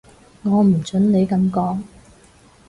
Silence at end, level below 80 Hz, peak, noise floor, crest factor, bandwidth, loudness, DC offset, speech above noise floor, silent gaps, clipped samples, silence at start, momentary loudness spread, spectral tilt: 0.8 s; -50 dBFS; -6 dBFS; -50 dBFS; 12 dB; 11 kHz; -18 LUFS; under 0.1%; 33 dB; none; under 0.1%; 0.45 s; 10 LU; -8.5 dB/octave